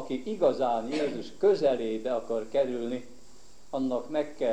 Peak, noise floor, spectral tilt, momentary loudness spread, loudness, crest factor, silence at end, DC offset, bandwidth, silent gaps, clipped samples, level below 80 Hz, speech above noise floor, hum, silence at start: -12 dBFS; -57 dBFS; -6 dB/octave; 9 LU; -29 LUFS; 16 dB; 0 s; 0.7%; 10 kHz; none; under 0.1%; -64 dBFS; 28 dB; none; 0 s